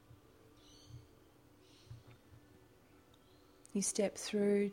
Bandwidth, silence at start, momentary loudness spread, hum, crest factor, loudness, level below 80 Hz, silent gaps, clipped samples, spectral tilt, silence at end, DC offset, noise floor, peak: 16.5 kHz; 0.9 s; 27 LU; none; 18 dB; -36 LUFS; -72 dBFS; none; under 0.1%; -4.5 dB/octave; 0 s; under 0.1%; -65 dBFS; -22 dBFS